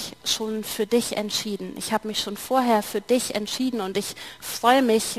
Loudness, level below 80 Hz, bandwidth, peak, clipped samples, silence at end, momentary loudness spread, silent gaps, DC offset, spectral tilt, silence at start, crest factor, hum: -24 LUFS; -60 dBFS; 15 kHz; -4 dBFS; under 0.1%; 0 s; 10 LU; none; 0.1%; -3 dB/octave; 0 s; 20 dB; none